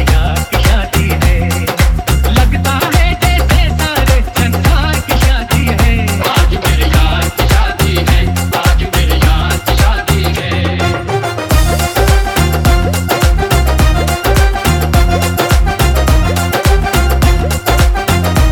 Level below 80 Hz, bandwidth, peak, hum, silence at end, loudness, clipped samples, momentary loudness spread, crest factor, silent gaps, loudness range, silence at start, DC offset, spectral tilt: -14 dBFS; 19.5 kHz; 0 dBFS; none; 0 s; -12 LUFS; under 0.1%; 2 LU; 10 dB; none; 1 LU; 0 s; under 0.1%; -5 dB/octave